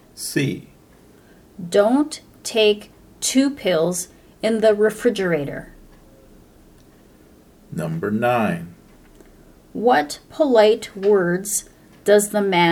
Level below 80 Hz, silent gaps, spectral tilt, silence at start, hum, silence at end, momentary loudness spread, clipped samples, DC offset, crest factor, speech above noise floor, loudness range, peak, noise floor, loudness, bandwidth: -54 dBFS; none; -4.5 dB/octave; 0.15 s; none; 0 s; 14 LU; under 0.1%; under 0.1%; 18 dB; 31 dB; 8 LU; -2 dBFS; -50 dBFS; -20 LUFS; 17.5 kHz